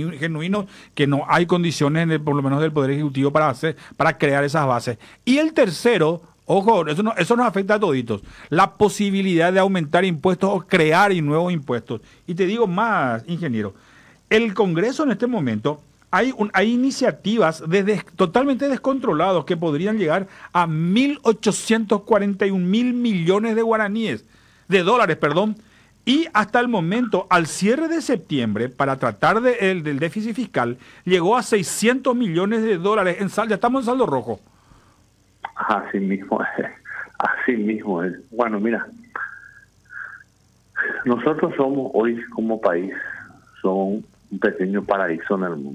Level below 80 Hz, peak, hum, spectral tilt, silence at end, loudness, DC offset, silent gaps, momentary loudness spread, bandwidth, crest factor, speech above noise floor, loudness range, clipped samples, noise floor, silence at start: -58 dBFS; -4 dBFS; none; -5.5 dB/octave; 0 s; -20 LUFS; under 0.1%; none; 9 LU; 15 kHz; 16 dB; 38 dB; 5 LU; under 0.1%; -57 dBFS; 0 s